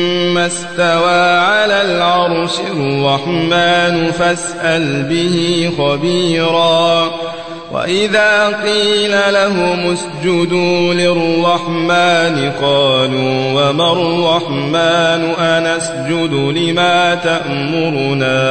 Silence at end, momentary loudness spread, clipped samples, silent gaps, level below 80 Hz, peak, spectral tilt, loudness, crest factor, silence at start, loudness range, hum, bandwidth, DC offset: 0 s; 6 LU; under 0.1%; none; -50 dBFS; -2 dBFS; -4.5 dB/octave; -13 LUFS; 12 dB; 0 s; 1 LU; none; 9.2 kHz; 0.8%